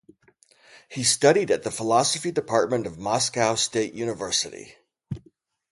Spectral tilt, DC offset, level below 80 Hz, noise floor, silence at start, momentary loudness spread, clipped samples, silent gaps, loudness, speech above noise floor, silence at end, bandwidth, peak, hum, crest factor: -3 dB/octave; under 0.1%; -60 dBFS; -60 dBFS; 0.75 s; 19 LU; under 0.1%; none; -23 LUFS; 37 dB; 0.55 s; 11.5 kHz; -4 dBFS; none; 22 dB